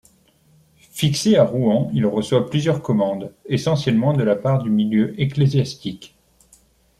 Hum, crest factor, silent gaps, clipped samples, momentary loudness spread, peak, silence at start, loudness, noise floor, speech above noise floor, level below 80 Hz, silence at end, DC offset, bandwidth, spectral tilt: none; 18 dB; none; under 0.1%; 10 LU; -2 dBFS; 0.95 s; -19 LUFS; -56 dBFS; 38 dB; -54 dBFS; 0.95 s; under 0.1%; 14 kHz; -6.5 dB/octave